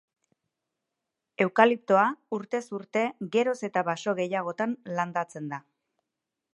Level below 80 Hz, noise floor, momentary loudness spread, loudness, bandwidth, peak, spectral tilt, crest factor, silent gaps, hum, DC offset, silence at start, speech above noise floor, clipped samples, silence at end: -80 dBFS; -86 dBFS; 13 LU; -27 LUFS; 11.5 kHz; -4 dBFS; -5.5 dB/octave; 26 dB; none; none; under 0.1%; 1.4 s; 59 dB; under 0.1%; 0.95 s